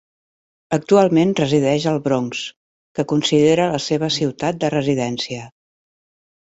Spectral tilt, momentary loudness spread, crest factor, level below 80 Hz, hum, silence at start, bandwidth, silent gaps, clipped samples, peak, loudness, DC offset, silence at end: -5.5 dB/octave; 12 LU; 18 dB; -56 dBFS; none; 0.7 s; 8.2 kHz; 2.56-2.95 s; under 0.1%; -2 dBFS; -18 LUFS; under 0.1%; 1 s